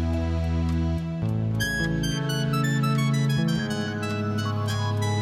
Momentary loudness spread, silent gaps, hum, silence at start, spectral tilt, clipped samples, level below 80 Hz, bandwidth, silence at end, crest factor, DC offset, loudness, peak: 5 LU; none; none; 0 s; -6 dB/octave; under 0.1%; -38 dBFS; 15 kHz; 0 s; 12 dB; under 0.1%; -26 LUFS; -12 dBFS